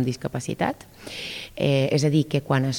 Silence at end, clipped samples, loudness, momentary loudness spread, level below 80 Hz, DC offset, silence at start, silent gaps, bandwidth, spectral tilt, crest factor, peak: 0 s; under 0.1%; -24 LUFS; 13 LU; -56 dBFS; under 0.1%; 0 s; none; 17 kHz; -6 dB/octave; 16 dB; -8 dBFS